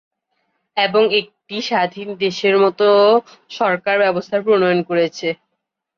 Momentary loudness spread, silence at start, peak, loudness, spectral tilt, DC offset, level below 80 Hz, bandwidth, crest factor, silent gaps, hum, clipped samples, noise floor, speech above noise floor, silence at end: 12 LU; 0.75 s; -4 dBFS; -17 LUFS; -5 dB/octave; under 0.1%; -68 dBFS; 7.2 kHz; 14 dB; none; none; under 0.1%; -76 dBFS; 60 dB; 0.65 s